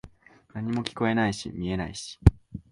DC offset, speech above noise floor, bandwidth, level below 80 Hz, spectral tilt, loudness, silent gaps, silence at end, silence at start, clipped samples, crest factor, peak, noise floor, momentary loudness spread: under 0.1%; 25 dB; 11.5 kHz; -34 dBFS; -6.5 dB/octave; -27 LUFS; none; 0.1 s; 0.05 s; under 0.1%; 26 dB; 0 dBFS; -51 dBFS; 12 LU